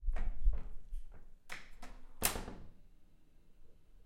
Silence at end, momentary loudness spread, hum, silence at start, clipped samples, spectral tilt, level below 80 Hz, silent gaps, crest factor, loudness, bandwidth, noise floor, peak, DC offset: 0.1 s; 23 LU; none; 0 s; under 0.1%; -2.5 dB/octave; -40 dBFS; none; 24 dB; -41 LUFS; 16 kHz; -59 dBFS; -14 dBFS; under 0.1%